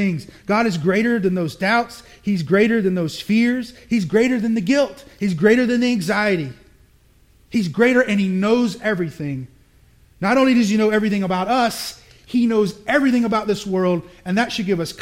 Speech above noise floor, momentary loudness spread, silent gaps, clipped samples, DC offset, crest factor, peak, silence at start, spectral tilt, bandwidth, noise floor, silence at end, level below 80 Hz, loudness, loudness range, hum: 35 dB; 9 LU; none; under 0.1%; under 0.1%; 16 dB; -2 dBFS; 0 s; -6 dB/octave; 16 kHz; -54 dBFS; 0 s; -52 dBFS; -19 LUFS; 2 LU; none